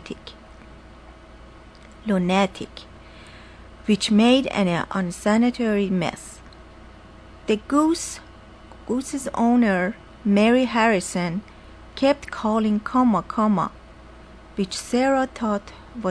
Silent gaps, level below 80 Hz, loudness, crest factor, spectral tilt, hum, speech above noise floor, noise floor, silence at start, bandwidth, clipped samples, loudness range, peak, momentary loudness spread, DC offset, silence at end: none; -48 dBFS; -22 LUFS; 18 dB; -5.5 dB/octave; none; 24 dB; -45 dBFS; 0 s; 11 kHz; under 0.1%; 6 LU; -4 dBFS; 19 LU; under 0.1%; 0 s